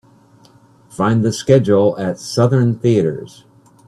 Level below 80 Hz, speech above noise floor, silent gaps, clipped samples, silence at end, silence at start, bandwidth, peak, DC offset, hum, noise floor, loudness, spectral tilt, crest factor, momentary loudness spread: -54 dBFS; 34 dB; none; under 0.1%; 0.6 s; 0.95 s; 12.5 kHz; 0 dBFS; under 0.1%; none; -48 dBFS; -15 LUFS; -7 dB/octave; 16 dB; 9 LU